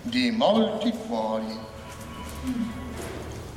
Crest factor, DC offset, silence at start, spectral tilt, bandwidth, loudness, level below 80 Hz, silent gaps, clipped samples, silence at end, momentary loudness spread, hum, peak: 18 dB; under 0.1%; 0 s; -5.5 dB/octave; 15.5 kHz; -27 LUFS; -46 dBFS; none; under 0.1%; 0 s; 16 LU; none; -8 dBFS